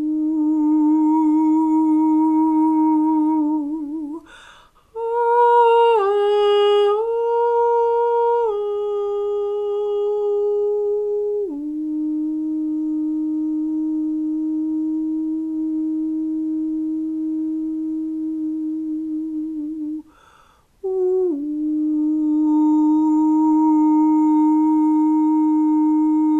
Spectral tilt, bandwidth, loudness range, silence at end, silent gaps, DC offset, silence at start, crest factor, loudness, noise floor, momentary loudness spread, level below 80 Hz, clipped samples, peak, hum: -6 dB/octave; 4 kHz; 8 LU; 0 s; none; under 0.1%; 0 s; 12 dB; -19 LUFS; -54 dBFS; 9 LU; -58 dBFS; under 0.1%; -6 dBFS; none